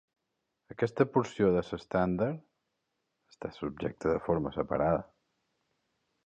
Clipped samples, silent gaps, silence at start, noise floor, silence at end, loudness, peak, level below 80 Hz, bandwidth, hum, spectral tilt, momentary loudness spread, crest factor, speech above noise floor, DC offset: under 0.1%; none; 0.7 s; -83 dBFS; 1.2 s; -31 LUFS; -12 dBFS; -56 dBFS; 8.8 kHz; none; -8 dB/octave; 12 LU; 22 dB; 53 dB; under 0.1%